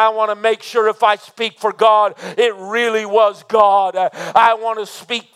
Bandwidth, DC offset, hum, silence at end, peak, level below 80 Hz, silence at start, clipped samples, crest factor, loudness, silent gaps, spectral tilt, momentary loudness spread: 14.5 kHz; under 0.1%; none; 0.15 s; 0 dBFS; -70 dBFS; 0 s; under 0.1%; 16 dB; -16 LUFS; none; -2.5 dB/octave; 8 LU